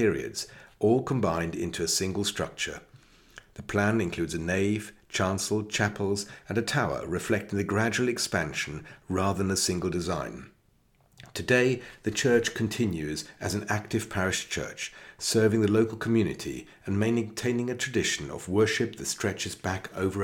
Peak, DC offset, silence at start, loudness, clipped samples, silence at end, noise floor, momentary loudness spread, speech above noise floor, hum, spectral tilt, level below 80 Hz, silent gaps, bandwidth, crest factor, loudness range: -10 dBFS; under 0.1%; 0 s; -28 LUFS; under 0.1%; 0 s; -65 dBFS; 10 LU; 37 dB; none; -4.5 dB/octave; -54 dBFS; none; 18 kHz; 20 dB; 2 LU